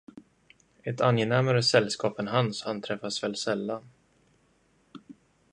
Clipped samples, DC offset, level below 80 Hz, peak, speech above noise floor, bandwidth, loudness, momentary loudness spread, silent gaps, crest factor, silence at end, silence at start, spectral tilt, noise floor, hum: under 0.1%; under 0.1%; -68 dBFS; -6 dBFS; 40 dB; 10.5 kHz; -27 LUFS; 12 LU; none; 24 dB; 0.4 s; 0.15 s; -5 dB/octave; -66 dBFS; none